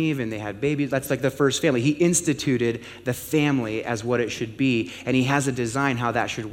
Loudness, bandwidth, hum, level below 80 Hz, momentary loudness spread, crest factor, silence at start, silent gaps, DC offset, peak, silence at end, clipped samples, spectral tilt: -23 LUFS; 17 kHz; none; -54 dBFS; 7 LU; 18 dB; 0 s; none; under 0.1%; -6 dBFS; 0 s; under 0.1%; -5 dB/octave